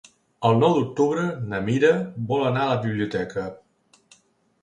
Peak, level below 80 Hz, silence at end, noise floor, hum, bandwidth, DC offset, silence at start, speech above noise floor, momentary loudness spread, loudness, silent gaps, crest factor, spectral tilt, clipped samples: -6 dBFS; -58 dBFS; 1.05 s; -60 dBFS; none; 9.6 kHz; under 0.1%; 0.4 s; 38 dB; 9 LU; -23 LUFS; none; 18 dB; -7 dB/octave; under 0.1%